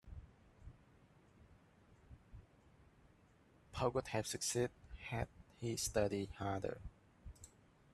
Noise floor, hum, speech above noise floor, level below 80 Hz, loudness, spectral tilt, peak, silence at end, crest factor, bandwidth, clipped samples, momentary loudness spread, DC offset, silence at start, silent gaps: -69 dBFS; none; 29 dB; -60 dBFS; -42 LUFS; -4 dB/octave; -22 dBFS; 0.45 s; 22 dB; 13 kHz; under 0.1%; 24 LU; under 0.1%; 0.05 s; none